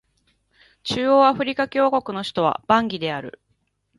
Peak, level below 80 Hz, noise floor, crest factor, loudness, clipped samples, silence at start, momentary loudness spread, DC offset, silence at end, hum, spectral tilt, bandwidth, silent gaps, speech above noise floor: -4 dBFS; -60 dBFS; -70 dBFS; 20 dB; -21 LUFS; under 0.1%; 0.85 s; 13 LU; under 0.1%; 0.7 s; none; -5.5 dB/octave; 11.5 kHz; none; 49 dB